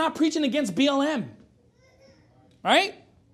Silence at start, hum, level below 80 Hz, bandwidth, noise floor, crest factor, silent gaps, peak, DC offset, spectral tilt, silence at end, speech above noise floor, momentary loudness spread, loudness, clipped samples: 0 s; none; -68 dBFS; 14.5 kHz; -59 dBFS; 20 dB; none; -6 dBFS; under 0.1%; -3.5 dB/octave; 0.4 s; 36 dB; 11 LU; -24 LUFS; under 0.1%